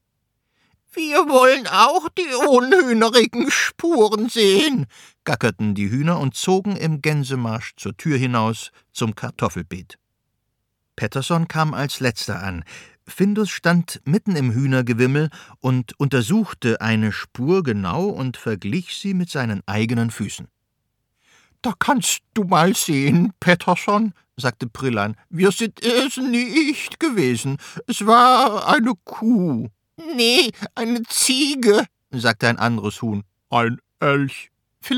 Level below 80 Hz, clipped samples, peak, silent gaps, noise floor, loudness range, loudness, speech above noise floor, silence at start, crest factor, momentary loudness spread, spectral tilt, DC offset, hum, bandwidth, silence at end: -56 dBFS; under 0.1%; 0 dBFS; none; -74 dBFS; 8 LU; -19 LUFS; 55 dB; 0.95 s; 20 dB; 12 LU; -4.5 dB/octave; under 0.1%; none; 18 kHz; 0 s